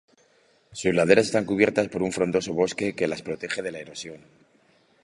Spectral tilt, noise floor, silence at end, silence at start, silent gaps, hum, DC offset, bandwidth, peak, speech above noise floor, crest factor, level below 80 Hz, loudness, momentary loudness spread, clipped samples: -5 dB/octave; -62 dBFS; 0.85 s; 0.7 s; none; none; under 0.1%; 11.5 kHz; -2 dBFS; 38 dB; 24 dB; -58 dBFS; -24 LUFS; 17 LU; under 0.1%